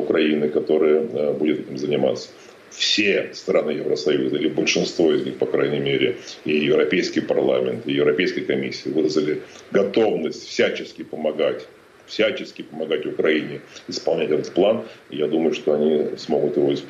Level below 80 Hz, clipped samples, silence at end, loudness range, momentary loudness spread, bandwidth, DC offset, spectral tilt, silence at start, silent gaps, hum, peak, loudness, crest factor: -64 dBFS; under 0.1%; 0 s; 3 LU; 9 LU; 8 kHz; under 0.1%; -4.5 dB/octave; 0 s; none; none; -6 dBFS; -21 LUFS; 14 dB